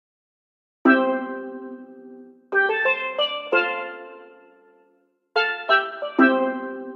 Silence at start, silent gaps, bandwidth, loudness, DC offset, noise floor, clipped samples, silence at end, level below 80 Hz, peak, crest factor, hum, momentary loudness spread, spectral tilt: 0.85 s; none; 6 kHz; -21 LUFS; under 0.1%; -64 dBFS; under 0.1%; 0 s; -86 dBFS; -4 dBFS; 20 dB; none; 19 LU; -5 dB/octave